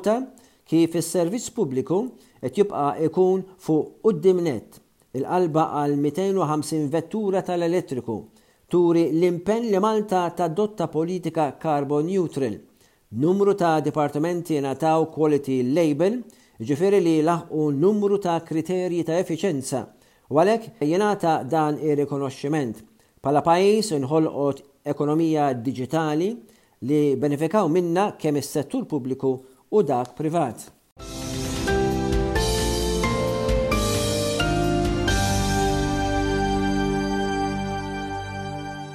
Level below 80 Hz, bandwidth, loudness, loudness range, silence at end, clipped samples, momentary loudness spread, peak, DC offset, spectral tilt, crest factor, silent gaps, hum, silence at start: -38 dBFS; 16 kHz; -23 LUFS; 3 LU; 0 s; under 0.1%; 10 LU; -6 dBFS; under 0.1%; -6 dB/octave; 18 dB; 30.92-30.96 s; none; 0 s